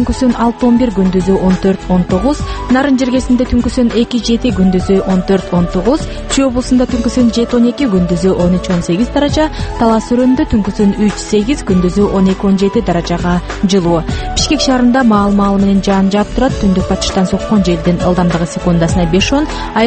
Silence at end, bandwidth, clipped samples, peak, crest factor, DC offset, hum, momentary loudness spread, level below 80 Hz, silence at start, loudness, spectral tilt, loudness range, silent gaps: 0 s; 8.8 kHz; under 0.1%; 0 dBFS; 12 dB; under 0.1%; none; 4 LU; -24 dBFS; 0 s; -12 LUFS; -6 dB/octave; 1 LU; none